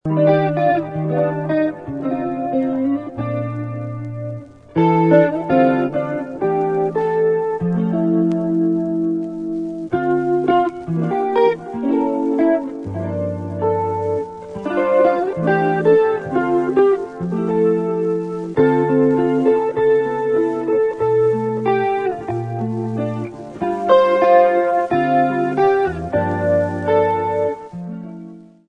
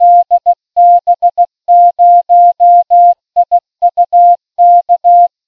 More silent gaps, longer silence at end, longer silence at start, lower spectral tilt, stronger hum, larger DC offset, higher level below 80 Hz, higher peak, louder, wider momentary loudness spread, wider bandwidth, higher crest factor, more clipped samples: neither; about the same, 0.25 s vs 0.2 s; about the same, 0.05 s vs 0 s; first, -9 dB/octave vs -5 dB/octave; neither; second, under 0.1% vs 0.2%; first, -52 dBFS vs -64 dBFS; about the same, 0 dBFS vs 0 dBFS; second, -18 LUFS vs -8 LUFS; first, 10 LU vs 6 LU; first, 9.2 kHz vs 0.9 kHz; first, 18 dB vs 6 dB; neither